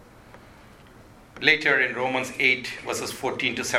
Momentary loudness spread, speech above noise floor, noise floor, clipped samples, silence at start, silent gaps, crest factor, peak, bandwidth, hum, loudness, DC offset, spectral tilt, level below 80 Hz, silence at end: 10 LU; 25 dB; -49 dBFS; under 0.1%; 0.25 s; none; 24 dB; -2 dBFS; 16.5 kHz; none; -23 LUFS; under 0.1%; -2.5 dB/octave; -58 dBFS; 0 s